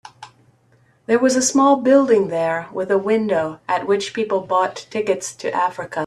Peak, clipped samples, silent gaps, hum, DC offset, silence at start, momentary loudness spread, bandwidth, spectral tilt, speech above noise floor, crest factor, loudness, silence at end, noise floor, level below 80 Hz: -2 dBFS; under 0.1%; none; none; under 0.1%; 0.2 s; 9 LU; 13 kHz; -4 dB/octave; 39 dB; 16 dB; -18 LUFS; 0 s; -57 dBFS; -64 dBFS